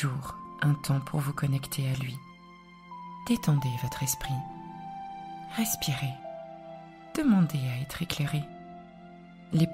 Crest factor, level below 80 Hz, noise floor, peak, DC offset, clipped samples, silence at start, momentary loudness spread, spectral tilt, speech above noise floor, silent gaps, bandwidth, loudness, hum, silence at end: 22 dB; -54 dBFS; -51 dBFS; -8 dBFS; under 0.1%; under 0.1%; 0 s; 21 LU; -5.5 dB/octave; 23 dB; none; 16 kHz; -30 LUFS; none; 0 s